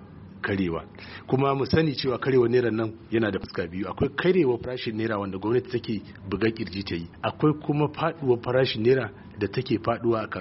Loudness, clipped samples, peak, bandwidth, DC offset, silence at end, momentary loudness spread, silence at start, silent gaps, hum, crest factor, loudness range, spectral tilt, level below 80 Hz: -26 LUFS; under 0.1%; -10 dBFS; 6 kHz; under 0.1%; 0 s; 10 LU; 0 s; none; none; 16 dB; 3 LU; -5.5 dB/octave; -52 dBFS